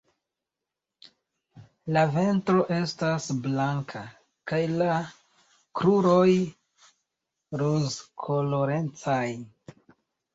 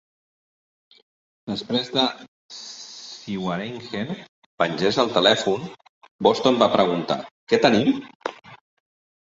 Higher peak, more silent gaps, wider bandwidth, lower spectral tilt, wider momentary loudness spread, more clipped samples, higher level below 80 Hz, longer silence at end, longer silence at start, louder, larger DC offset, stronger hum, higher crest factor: second, -10 dBFS vs -2 dBFS; second, none vs 2.28-2.49 s, 4.29-4.58 s, 5.89-6.01 s, 6.11-6.19 s, 7.31-7.47 s, 8.15-8.20 s; about the same, 8 kHz vs 8 kHz; first, -6.5 dB/octave vs -4.5 dB/octave; about the same, 17 LU vs 19 LU; neither; about the same, -64 dBFS vs -64 dBFS; first, 0.9 s vs 0.7 s; about the same, 1.55 s vs 1.45 s; second, -26 LUFS vs -22 LUFS; neither; neither; about the same, 18 dB vs 22 dB